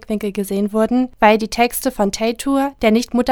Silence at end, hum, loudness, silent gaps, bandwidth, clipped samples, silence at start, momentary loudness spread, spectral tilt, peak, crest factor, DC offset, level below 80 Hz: 0 s; none; -17 LUFS; none; 20 kHz; under 0.1%; 0.1 s; 7 LU; -4.5 dB/octave; 0 dBFS; 16 dB; under 0.1%; -42 dBFS